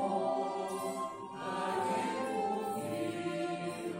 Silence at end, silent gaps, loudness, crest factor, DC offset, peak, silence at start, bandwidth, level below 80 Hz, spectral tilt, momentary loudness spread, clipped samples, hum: 0 s; none; -36 LUFS; 14 dB; under 0.1%; -22 dBFS; 0 s; 16 kHz; -76 dBFS; -5 dB/octave; 5 LU; under 0.1%; none